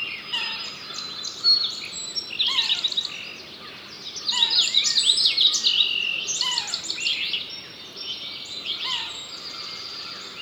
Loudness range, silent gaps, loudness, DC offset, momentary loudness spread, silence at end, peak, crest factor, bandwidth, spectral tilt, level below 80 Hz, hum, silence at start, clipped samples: 8 LU; none; -22 LUFS; under 0.1%; 17 LU; 0 s; -4 dBFS; 20 dB; over 20 kHz; 1.5 dB/octave; -70 dBFS; none; 0 s; under 0.1%